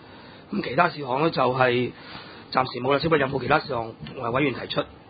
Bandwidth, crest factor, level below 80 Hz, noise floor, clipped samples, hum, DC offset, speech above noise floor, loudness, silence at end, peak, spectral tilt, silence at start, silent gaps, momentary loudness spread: 5 kHz; 22 dB; -54 dBFS; -45 dBFS; under 0.1%; none; under 0.1%; 21 dB; -24 LUFS; 0 s; -4 dBFS; -10.5 dB/octave; 0 s; none; 11 LU